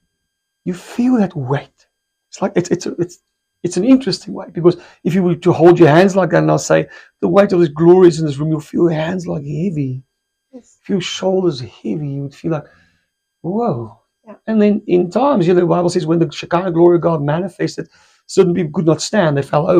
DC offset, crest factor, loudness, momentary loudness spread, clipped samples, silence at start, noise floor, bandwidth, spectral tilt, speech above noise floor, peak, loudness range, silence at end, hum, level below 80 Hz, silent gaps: under 0.1%; 16 dB; -15 LUFS; 14 LU; under 0.1%; 0.65 s; -74 dBFS; 9.8 kHz; -6.5 dB/octave; 59 dB; 0 dBFS; 9 LU; 0 s; none; -54 dBFS; none